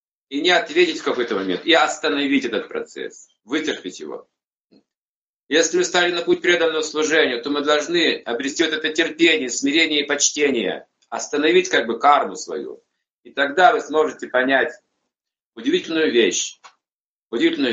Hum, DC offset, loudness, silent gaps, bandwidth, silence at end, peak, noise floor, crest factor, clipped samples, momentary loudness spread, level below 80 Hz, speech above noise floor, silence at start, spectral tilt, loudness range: none; under 0.1%; -19 LUFS; 4.46-4.51 s, 4.60-4.68 s, 4.97-5.47 s, 13.12-13.23 s, 15.45-15.52 s, 16.95-17.30 s; 8.2 kHz; 0 s; -2 dBFS; under -90 dBFS; 20 dB; under 0.1%; 14 LU; -68 dBFS; over 70 dB; 0.3 s; -2 dB/octave; 5 LU